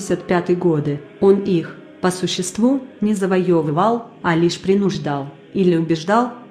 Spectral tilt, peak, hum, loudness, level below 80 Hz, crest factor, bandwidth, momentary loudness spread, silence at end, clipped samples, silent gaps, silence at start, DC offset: -6 dB/octave; -2 dBFS; none; -19 LUFS; -56 dBFS; 16 dB; 14 kHz; 6 LU; 0 s; under 0.1%; none; 0 s; under 0.1%